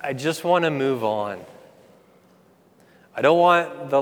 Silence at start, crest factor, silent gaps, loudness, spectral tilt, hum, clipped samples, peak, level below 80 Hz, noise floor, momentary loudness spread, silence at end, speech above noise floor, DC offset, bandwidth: 0 s; 20 dB; none; -21 LUFS; -5.5 dB/octave; none; under 0.1%; -4 dBFS; -76 dBFS; -56 dBFS; 14 LU; 0 s; 35 dB; under 0.1%; 18.5 kHz